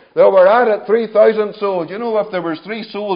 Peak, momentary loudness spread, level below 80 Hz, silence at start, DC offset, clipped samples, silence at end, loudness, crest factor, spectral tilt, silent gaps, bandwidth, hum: 0 dBFS; 13 LU; -74 dBFS; 0.15 s; under 0.1%; under 0.1%; 0 s; -14 LUFS; 14 dB; -10.5 dB/octave; none; 5.2 kHz; none